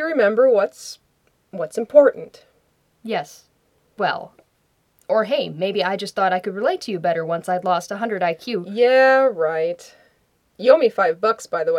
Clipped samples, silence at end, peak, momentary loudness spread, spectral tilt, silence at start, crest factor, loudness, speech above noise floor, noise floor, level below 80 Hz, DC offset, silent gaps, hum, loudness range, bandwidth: under 0.1%; 0 s; 0 dBFS; 13 LU; -4.5 dB/octave; 0 s; 20 dB; -19 LUFS; 46 dB; -65 dBFS; -72 dBFS; under 0.1%; none; none; 7 LU; 13.5 kHz